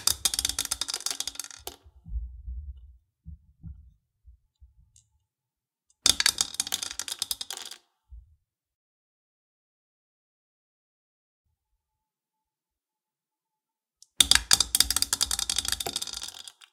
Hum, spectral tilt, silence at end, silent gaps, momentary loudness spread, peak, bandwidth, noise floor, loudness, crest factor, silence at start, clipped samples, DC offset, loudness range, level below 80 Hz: none; 0.5 dB/octave; 0.1 s; 8.74-11.44 s; 22 LU; 0 dBFS; 17 kHz; under -90 dBFS; -25 LUFS; 32 dB; 0 s; under 0.1%; under 0.1%; 21 LU; -48 dBFS